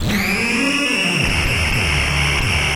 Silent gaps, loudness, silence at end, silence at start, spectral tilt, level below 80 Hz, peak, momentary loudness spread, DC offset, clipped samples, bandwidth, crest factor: none; -16 LUFS; 0 s; 0 s; -3.5 dB/octave; -26 dBFS; -6 dBFS; 1 LU; under 0.1%; under 0.1%; 17 kHz; 12 dB